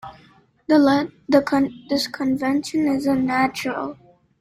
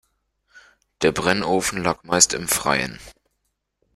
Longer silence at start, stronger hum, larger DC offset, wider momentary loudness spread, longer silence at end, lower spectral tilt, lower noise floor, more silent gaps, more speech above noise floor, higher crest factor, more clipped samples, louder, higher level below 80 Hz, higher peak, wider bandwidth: second, 0.05 s vs 0.55 s; second, none vs 50 Hz at -50 dBFS; neither; first, 10 LU vs 7 LU; second, 0.5 s vs 0.85 s; first, -5 dB/octave vs -2.5 dB/octave; second, -54 dBFS vs -75 dBFS; neither; second, 34 dB vs 54 dB; second, 18 dB vs 24 dB; neither; about the same, -20 LUFS vs -20 LUFS; second, -56 dBFS vs -50 dBFS; second, -4 dBFS vs 0 dBFS; second, 14.5 kHz vs 16 kHz